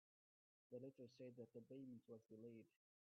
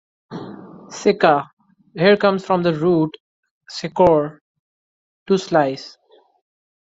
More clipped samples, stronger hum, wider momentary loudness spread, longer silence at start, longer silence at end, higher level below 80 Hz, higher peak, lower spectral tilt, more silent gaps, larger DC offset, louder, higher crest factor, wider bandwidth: neither; neither; second, 4 LU vs 21 LU; first, 0.7 s vs 0.3 s; second, 0.3 s vs 1.05 s; second, under -90 dBFS vs -56 dBFS; second, -46 dBFS vs -2 dBFS; first, -8 dB/octave vs -6 dB/octave; second, none vs 1.53-1.57 s, 3.20-3.43 s, 3.51-3.61 s, 4.41-5.26 s; neither; second, -61 LUFS vs -18 LUFS; about the same, 16 dB vs 18 dB; second, 6 kHz vs 7.8 kHz